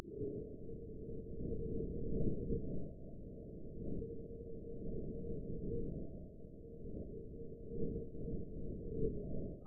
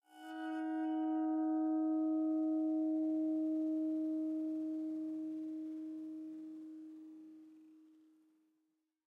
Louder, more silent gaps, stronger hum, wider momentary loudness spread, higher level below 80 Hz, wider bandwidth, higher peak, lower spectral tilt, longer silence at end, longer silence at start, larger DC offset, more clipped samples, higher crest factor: second, -46 LUFS vs -38 LUFS; neither; neither; second, 10 LU vs 16 LU; first, -50 dBFS vs under -90 dBFS; second, 0.8 kHz vs 3.2 kHz; first, -24 dBFS vs -30 dBFS; second, -2.5 dB/octave vs -6.5 dB/octave; second, 0 s vs 1.3 s; about the same, 0 s vs 0.1 s; neither; neither; first, 18 dB vs 10 dB